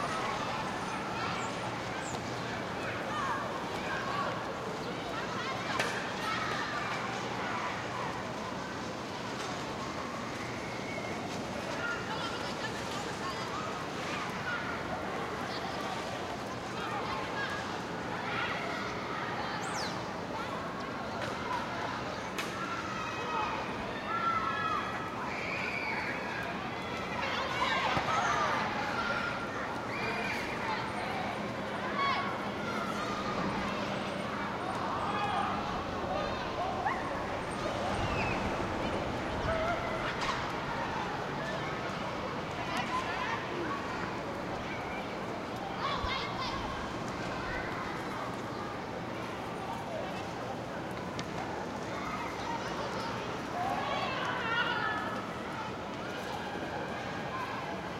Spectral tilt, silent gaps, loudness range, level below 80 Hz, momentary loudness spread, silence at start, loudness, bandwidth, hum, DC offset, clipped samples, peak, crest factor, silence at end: -4.5 dB/octave; none; 4 LU; -56 dBFS; 6 LU; 0 s; -35 LUFS; 16 kHz; none; under 0.1%; under 0.1%; -16 dBFS; 20 dB; 0 s